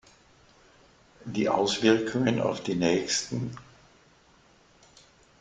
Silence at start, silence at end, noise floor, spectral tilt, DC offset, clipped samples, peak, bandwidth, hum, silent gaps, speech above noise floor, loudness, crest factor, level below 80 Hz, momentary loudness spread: 1.25 s; 1.8 s; -60 dBFS; -4.5 dB/octave; under 0.1%; under 0.1%; -8 dBFS; 9.6 kHz; none; none; 34 dB; -27 LUFS; 22 dB; -62 dBFS; 13 LU